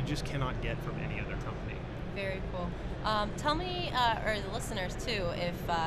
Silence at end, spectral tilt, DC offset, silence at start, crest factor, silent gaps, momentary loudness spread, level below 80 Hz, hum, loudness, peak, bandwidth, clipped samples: 0 s; -5 dB/octave; under 0.1%; 0 s; 18 dB; none; 9 LU; -42 dBFS; none; -34 LUFS; -16 dBFS; 13.5 kHz; under 0.1%